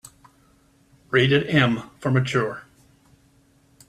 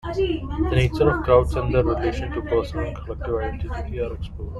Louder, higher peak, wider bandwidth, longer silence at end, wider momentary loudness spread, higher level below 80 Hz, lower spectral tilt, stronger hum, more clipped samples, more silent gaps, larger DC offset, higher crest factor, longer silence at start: about the same, -21 LUFS vs -23 LUFS; about the same, -2 dBFS vs -2 dBFS; about the same, 12.5 kHz vs 12 kHz; first, 1.25 s vs 0 s; about the same, 10 LU vs 11 LU; second, -58 dBFS vs -30 dBFS; second, -6.5 dB/octave vs -8 dB/octave; neither; neither; neither; neither; about the same, 22 dB vs 20 dB; first, 1.1 s vs 0.05 s